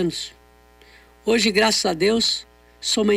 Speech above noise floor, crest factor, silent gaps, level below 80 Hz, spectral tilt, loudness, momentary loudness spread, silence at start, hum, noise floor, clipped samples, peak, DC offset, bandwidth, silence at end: 32 dB; 16 dB; none; -52 dBFS; -3 dB/octave; -20 LUFS; 13 LU; 0 s; 60 Hz at -45 dBFS; -52 dBFS; under 0.1%; -6 dBFS; under 0.1%; 16 kHz; 0 s